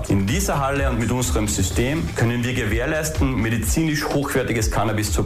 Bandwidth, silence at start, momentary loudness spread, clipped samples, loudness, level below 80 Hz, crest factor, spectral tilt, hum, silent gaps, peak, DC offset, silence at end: 15.5 kHz; 0 s; 1 LU; under 0.1%; -21 LUFS; -30 dBFS; 10 dB; -5 dB/octave; none; none; -10 dBFS; under 0.1%; 0 s